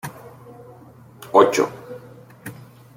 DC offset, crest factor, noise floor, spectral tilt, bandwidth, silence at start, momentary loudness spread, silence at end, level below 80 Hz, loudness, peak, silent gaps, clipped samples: under 0.1%; 22 dB; -46 dBFS; -4.5 dB/octave; 17 kHz; 0.05 s; 27 LU; 0.45 s; -66 dBFS; -18 LUFS; -2 dBFS; none; under 0.1%